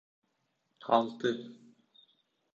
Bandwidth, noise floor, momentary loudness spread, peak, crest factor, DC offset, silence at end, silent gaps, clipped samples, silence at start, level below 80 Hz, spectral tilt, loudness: 7.6 kHz; -79 dBFS; 19 LU; -12 dBFS; 24 dB; under 0.1%; 1 s; none; under 0.1%; 0.85 s; -82 dBFS; -5.5 dB/octave; -31 LUFS